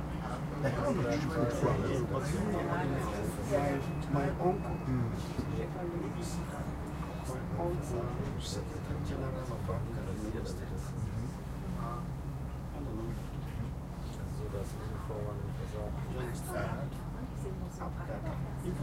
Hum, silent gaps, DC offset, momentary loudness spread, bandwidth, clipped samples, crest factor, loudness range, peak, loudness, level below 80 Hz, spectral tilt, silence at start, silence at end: none; none; under 0.1%; 8 LU; 16 kHz; under 0.1%; 18 dB; 7 LU; -18 dBFS; -37 LUFS; -44 dBFS; -7 dB/octave; 0 s; 0 s